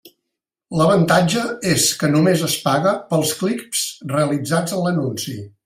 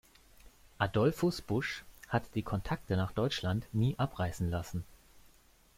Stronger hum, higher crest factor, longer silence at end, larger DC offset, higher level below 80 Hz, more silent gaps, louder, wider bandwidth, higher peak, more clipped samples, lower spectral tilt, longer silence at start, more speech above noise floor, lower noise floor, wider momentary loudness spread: neither; about the same, 16 dB vs 20 dB; second, 0.15 s vs 0.6 s; neither; about the same, -56 dBFS vs -54 dBFS; neither; first, -18 LUFS vs -34 LUFS; about the same, 16 kHz vs 16.5 kHz; first, -2 dBFS vs -16 dBFS; neither; second, -4.5 dB/octave vs -6.5 dB/octave; second, 0.05 s vs 0.8 s; first, 62 dB vs 30 dB; first, -81 dBFS vs -63 dBFS; about the same, 7 LU vs 9 LU